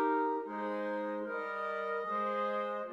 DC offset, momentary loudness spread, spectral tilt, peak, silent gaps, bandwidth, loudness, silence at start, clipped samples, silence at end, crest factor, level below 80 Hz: under 0.1%; 4 LU; -7 dB/octave; -22 dBFS; none; 7.8 kHz; -36 LUFS; 0 s; under 0.1%; 0 s; 14 dB; -88 dBFS